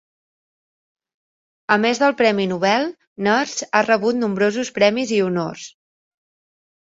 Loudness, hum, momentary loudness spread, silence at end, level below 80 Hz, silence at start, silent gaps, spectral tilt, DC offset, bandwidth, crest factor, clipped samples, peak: -19 LUFS; none; 11 LU; 1.15 s; -66 dBFS; 1.7 s; 3.07-3.16 s; -4.5 dB/octave; under 0.1%; 8 kHz; 20 dB; under 0.1%; -2 dBFS